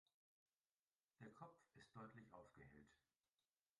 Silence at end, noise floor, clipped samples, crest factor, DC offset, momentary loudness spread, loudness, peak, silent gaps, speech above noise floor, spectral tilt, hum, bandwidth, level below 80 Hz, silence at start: 0.8 s; under -90 dBFS; under 0.1%; 20 dB; under 0.1%; 6 LU; -65 LUFS; -48 dBFS; none; over 26 dB; -6.5 dB/octave; none; 10.5 kHz; -88 dBFS; 1.2 s